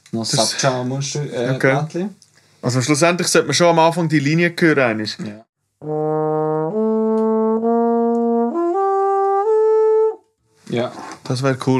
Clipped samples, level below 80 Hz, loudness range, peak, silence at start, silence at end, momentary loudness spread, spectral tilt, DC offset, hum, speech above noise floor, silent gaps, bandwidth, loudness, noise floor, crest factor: under 0.1%; -74 dBFS; 3 LU; 0 dBFS; 0.15 s; 0 s; 11 LU; -5 dB/octave; under 0.1%; none; 37 dB; 5.49-5.53 s; 13.5 kHz; -17 LUFS; -55 dBFS; 18 dB